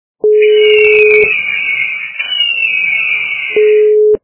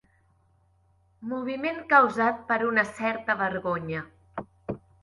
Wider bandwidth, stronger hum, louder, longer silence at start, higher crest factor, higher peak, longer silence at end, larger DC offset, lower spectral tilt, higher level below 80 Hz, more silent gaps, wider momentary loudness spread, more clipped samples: second, 4 kHz vs 11.5 kHz; neither; first, -9 LUFS vs -26 LUFS; second, 0.25 s vs 1.2 s; second, 10 dB vs 20 dB; first, 0 dBFS vs -8 dBFS; second, 0.05 s vs 0.25 s; neither; about the same, -5.5 dB/octave vs -6 dB/octave; first, -52 dBFS vs -62 dBFS; neither; second, 7 LU vs 19 LU; first, 0.3% vs under 0.1%